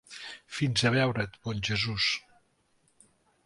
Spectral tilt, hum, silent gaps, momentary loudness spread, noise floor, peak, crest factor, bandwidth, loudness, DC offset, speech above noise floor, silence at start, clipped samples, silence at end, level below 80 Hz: -4.5 dB/octave; none; none; 14 LU; -70 dBFS; -10 dBFS; 20 dB; 11.5 kHz; -29 LUFS; under 0.1%; 41 dB; 0.1 s; under 0.1%; 1.25 s; -56 dBFS